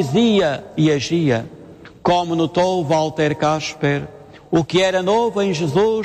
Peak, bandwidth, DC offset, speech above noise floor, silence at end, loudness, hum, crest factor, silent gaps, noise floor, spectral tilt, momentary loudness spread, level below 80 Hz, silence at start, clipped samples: -4 dBFS; 12 kHz; under 0.1%; 23 dB; 0 s; -18 LUFS; none; 14 dB; none; -41 dBFS; -6 dB/octave; 5 LU; -50 dBFS; 0 s; under 0.1%